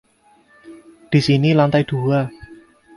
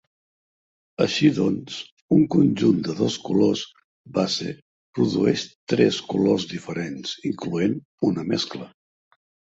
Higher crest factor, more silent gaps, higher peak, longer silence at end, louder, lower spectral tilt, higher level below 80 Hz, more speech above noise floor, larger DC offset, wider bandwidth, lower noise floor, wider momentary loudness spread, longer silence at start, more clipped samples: about the same, 18 dB vs 18 dB; second, none vs 1.92-2.09 s, 3.84-4.04 s, 4.62-4.93 s, 5.55-5.67 s, 7.85-7.98 s; about the same, -2 dBFS vs -4 dBFS; second, 0.45 s vs 0.9 s; first, -17 LUFS vs -23 LUFS; first, -7.5 dB/octave vs -6 dB/octave; first, -52 dBFS vs -58 dBFS; second, 39 dB vs over 68 dB; neither; first, 11.5 kHz vs 8 kHz; second, -55 dBFS vs under -90 dBFS; second, 6 LU vs 15 LU; second, 0.65 s vs 1 s; neither